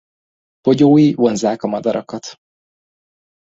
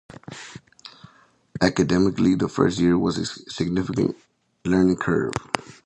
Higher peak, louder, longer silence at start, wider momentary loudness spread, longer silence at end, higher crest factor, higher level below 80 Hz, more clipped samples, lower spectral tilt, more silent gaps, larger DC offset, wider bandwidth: about the same, -2 dBFS vs 0 dBFS; first, -15 LUFS vs -22 LUFS; first, 0.65 s vs 0.3 s; about the same, 19 LU vs 21 LU; first, 1.15 s vs 0.25 s; second, 16 dB vs 22 dB; second, -56 dBFS vs -48 dBFS; neither; about the same, -7 dB/octave vs -6 dB/octave; neither; neither; second, 8 kHz vs 10.5 kHz